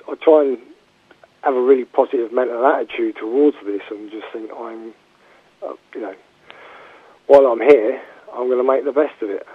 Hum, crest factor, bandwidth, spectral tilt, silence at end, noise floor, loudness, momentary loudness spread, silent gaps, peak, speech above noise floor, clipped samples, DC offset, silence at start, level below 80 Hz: none; 18 dB; 5.6 kHz; -6 dB/octave; 0 s; -53 dBFS; -17 LUFS; 20 LU; none; 0 dBFS; 36 dB; under 0.1%; under 0.1%; 0.1 s; -66 dBFS